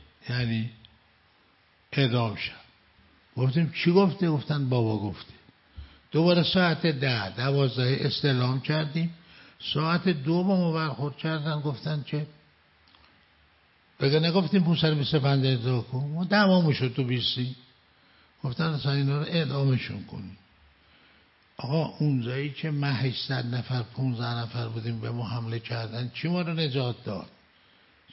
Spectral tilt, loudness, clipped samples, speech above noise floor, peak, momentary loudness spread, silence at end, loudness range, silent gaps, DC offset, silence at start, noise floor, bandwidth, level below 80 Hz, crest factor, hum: -10.5 dB/octave; -27 LUFS; under 0.1%; 37 dB; -8 dBFS; 12 LU; 0.85 s; 6 LU; none; under 0.1%; 0.25 s; -63 dBFS; 5.8 kHz; -62 dBFS; 18 dB; none